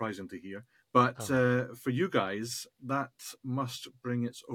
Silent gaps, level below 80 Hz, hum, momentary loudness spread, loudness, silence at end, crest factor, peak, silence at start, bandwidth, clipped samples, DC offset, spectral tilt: none; -74 dBFS; none; 16 LU; -32 LUFS; 0 s; 22 dB; -10 dBFS; 0 s; 17.5 kHz; under 0.1%; under 0.1%; -5.5 dB/octave